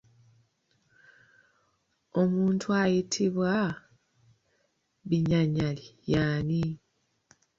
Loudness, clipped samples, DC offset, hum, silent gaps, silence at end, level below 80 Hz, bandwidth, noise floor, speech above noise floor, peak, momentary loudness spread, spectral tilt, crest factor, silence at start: -28 LUFS; under 0.1%; under 0.1%; none; none; 0.85 s; -56 dBFS; 7.6 kHz; -74 dBFS; 47 dB; -14 dBFS; 9 LU; -6.5 dB/octave; 16 dB; 2.15 s